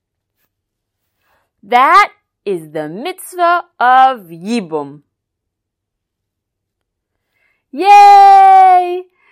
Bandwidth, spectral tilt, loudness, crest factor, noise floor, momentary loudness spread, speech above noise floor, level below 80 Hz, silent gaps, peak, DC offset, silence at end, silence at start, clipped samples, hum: 14.5 kHz; -3.5 dB/octave; -8 LUFS; 12 dB; -77 dBFS; 20 LU; 68 dB; -62 dBFS; none; 0 dBFS; under 0.1%; 0.3 s; 1.7 s; under 0.1%; none